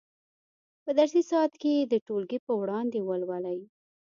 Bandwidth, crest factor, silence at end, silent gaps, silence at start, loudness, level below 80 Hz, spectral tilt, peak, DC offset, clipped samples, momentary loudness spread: 7.4 kHz; 18 dB; 0.5 s; 2.01-2.06 s, 2.39-2.47 s; 0.85 s; -28 LUFS; -82 dBFS; -6 dB/octave; -12 dBFS; under 0.1%; under 0.1%; 10 LU